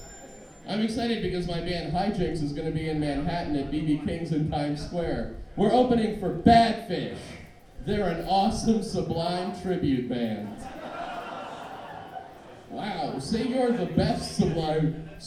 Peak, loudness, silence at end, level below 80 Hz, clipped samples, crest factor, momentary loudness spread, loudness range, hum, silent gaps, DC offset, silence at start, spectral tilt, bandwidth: -4 dBFS; -27 LUFS; 0 s; -44 dBFS; under 0.1%; 22 dB; 16 LU; 8 LU; none; none; under 0.1%; 0 s; -6.5 dB/octave; 14 kHz